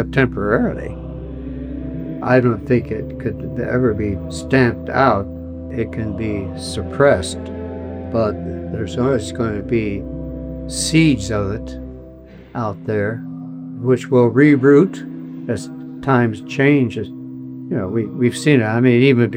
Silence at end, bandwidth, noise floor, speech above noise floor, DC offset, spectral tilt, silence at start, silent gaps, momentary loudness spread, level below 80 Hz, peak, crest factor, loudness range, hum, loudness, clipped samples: 0 s; 14.5 kHz; -39 dBFS; 22 dB; under 0.1%; -6.5 dB/octave; 0 s; none; 16 LU; -38 dBFS; -2 dBFS; 16 dB; 5 LU; none; -18 LUFS; under 0.1%